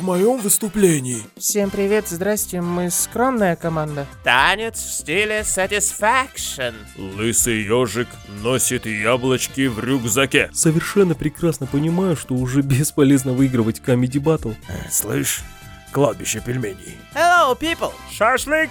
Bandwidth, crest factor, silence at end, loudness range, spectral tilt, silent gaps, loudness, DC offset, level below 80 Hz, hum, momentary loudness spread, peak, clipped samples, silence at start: over 20 kHz; 20 dB; 0 s; 2 LU; -4 dB/octave; none; -19 LUFS; under 0.1%; -44 dBFS; none; 10 LU; 0 dBFS; under 0.1%; 0 s